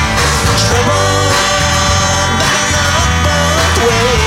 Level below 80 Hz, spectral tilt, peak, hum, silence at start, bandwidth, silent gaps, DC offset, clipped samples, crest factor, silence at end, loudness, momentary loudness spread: -22 dBFS; -3 dB/octave; 0 dBFS; none; 0 s; 16.5 kHz; none; under 0.1%; under 0.1%; 10 dB; 0 s; -11 LUFS; 1 LU